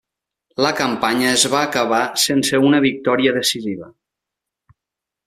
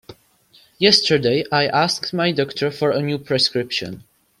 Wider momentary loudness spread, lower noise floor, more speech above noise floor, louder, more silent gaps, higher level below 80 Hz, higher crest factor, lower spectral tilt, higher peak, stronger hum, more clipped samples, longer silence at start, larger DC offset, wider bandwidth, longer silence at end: about the same, 8 LU vs 10 LU; first, -85 dBFS vs -54 dBFS; first, 68 dB vs 35 dB; about the same, -17 LUFS vs -18 LUFS; neither; about the same, -60 dBFS vs -58 dBFS; about the same, 20 dB vs 20 dB; about the same, -3 dB/octave vs -4 dB/octave; about the same, 0 dBFS vs 0 dBFS; neither; neither; first, 0.6 s vs 0.1 s; neither; about the same, 15 kHz vs 15.5 kHz; first, 1.35 s vs 0.4 s